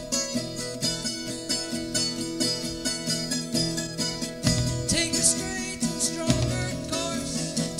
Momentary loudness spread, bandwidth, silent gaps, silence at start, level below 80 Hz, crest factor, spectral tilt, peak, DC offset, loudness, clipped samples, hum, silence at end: 6 LU; 16 kHz; none; 0 s; -44 dBFS; 22 dB; -3 dB/octave; -6 dBFS; under 0.1%; -26 LUFS; under 0.1%; none; 0 s